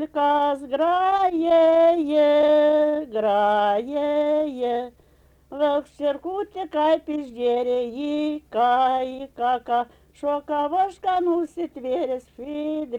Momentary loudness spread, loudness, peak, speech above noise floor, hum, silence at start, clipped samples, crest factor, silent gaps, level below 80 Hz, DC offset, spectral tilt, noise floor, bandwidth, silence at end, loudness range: 12 LU; -22 LUFS; -10 dBFS; 35 dB; none; 0 s; under 0.1%; 12 dB; none; -60 dBFS; under 0.1%; -5.5 dB/octave; -56 dBFS; 9.2 kHz; 0 s; 6 LU